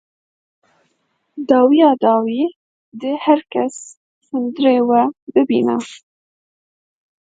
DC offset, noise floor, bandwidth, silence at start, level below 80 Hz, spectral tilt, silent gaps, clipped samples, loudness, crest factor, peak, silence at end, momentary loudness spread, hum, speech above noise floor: under 0.1%; -67 dBFS; 9.2 kHz; 1.35 s; -68 dBFS; -5.5 dB/octave; 2.56-2.92 s, 3.97-4.21 s, 5.22-5.27 s; under 0.1%; -16 LUFS; 18 dB; 0 dBFS; 1.25 s; 15 LU; none; 52 dB